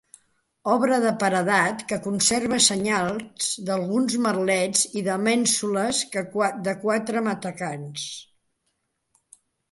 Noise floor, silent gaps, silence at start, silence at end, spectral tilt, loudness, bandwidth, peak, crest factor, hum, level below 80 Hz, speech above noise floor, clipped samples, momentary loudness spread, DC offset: -75 dBFS; none; 0.65 s; 1.5 s; -3 dB/octave; -23 LUFS; 12 kHz; -4 dBFS; 20 dB; none; -64 dBFS; 51 dB; under 0.1%; 11 LU; under 0.1%